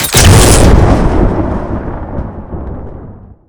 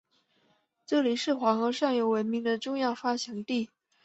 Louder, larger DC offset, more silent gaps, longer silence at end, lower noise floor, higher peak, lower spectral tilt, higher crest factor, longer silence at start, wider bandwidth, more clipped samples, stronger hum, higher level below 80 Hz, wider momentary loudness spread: first, -8 LUFS vs -29 LUFS; neither; neither; second, 0.25 s vs 0.4 s; second, -31 dBFS vs -70 dBFS; first, 0 dBFS vs -12 dBFS; about the same, -4.5 dB/octave vs -4.5 dB/octave; second, 10 dB vs 18 dB; second, 0 s vs 0.9 s; first, over 20 kHz vs 8.2 kHz; first, 3% vs under 0.1%; neither; first, -14 dBFS vs -76 dBFS; first, 20 LU vs 6 LU